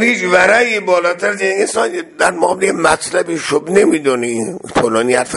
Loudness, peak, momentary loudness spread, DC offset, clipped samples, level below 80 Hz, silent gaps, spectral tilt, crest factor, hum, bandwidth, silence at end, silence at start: -14 LUFS; 0 dBFS; 7 LU; under 0.1%; under 0.1%; -50 dBFS; none; -3.5 dB/octave; 14 dB; none; 11.5 kHz; 0 s; 0 s